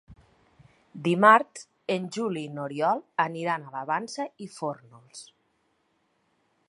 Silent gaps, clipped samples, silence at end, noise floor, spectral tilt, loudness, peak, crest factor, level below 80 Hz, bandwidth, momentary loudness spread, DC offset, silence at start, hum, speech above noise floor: none; under 0.1%; 1.45 s; -72 dBFS; -5 dB/octave; -26 LUFS; -2 dBFS; 26 dB; -70 dBFS; 11.5 kHz; 23 LU; under 0.1%; 0.1 s; none; 45 dB